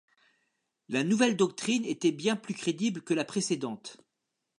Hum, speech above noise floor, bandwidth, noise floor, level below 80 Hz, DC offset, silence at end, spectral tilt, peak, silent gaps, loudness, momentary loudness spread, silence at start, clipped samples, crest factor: none; 55 dB; 11 kHz; -84 dBFS; -80 dBFS; under 0.1%; 0.65 s; -4.5 dB/octave; -12 dBFS; none; -29 LUFS; 8 LU; 0.9 s; under 0.1%; 18 dB